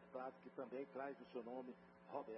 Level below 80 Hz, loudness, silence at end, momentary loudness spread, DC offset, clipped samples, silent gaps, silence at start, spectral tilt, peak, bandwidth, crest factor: under -90 dBFS; -53 LUFS; 0 s; 4 LU; under 0.1%; under 0.1%; none; 0 s; -5 dB/octave; -34 dBFS; 5.6 kHz; 18 dB